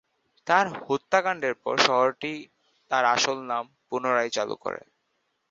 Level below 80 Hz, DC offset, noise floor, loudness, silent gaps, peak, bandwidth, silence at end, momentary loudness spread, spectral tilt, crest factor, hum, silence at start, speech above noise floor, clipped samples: -72 dBFS; under 0.1%; -75 dBFS; -25 LUFS; none; -4 dBFS; 7.8 kHz; 0.7 s; 12 LU; -2.5 dB/octave; 22 dB; none; 0.45 s; 50 dB; under 0.1%